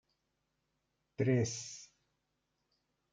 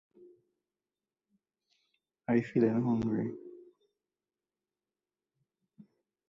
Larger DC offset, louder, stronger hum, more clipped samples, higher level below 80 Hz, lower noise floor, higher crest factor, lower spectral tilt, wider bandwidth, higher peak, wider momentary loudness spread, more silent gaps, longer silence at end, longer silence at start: neither; second, -35 LUFS vs -31 LUFS; neither; neither; second, -76 dBFS vs -70 dBFS; second, -83 dBFS vs under -90 dBFS; about the same, 20 dB vs 22 dB; second, -5.5 dB/octave vs -9.5 dB/octave; first, 9.4 kHz vs 7 kHz; second, -20 dBFS vs -16 dBFS; about the same, 19 LU vs 18 LU; neither; second, 1.3 s vs 2.7 s; second, 1.2 s vs 2.3 s